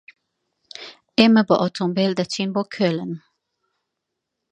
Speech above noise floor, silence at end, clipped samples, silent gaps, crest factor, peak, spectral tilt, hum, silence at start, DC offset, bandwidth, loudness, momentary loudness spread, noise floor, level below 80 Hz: 62 dB; 1.35 s; under 0.1%; none; 22 dB; 0 dBFS; -6 dB/octave; none; 0.8 s; under 0.1%; 9.2 kHz; -20 LUFS; 22 LU; -81 dBFS; -68 dBFS